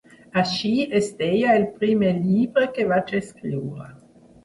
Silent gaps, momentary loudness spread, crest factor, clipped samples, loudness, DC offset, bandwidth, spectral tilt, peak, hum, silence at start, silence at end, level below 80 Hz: none; 10 LU; 16 dB; under 0.1%; -22 LUFS; under 0.1%; 11.5 kHz; -6.5 dB/octave; -6 dBFS; none; 0.35 s; 0.5 s; -58 dBFS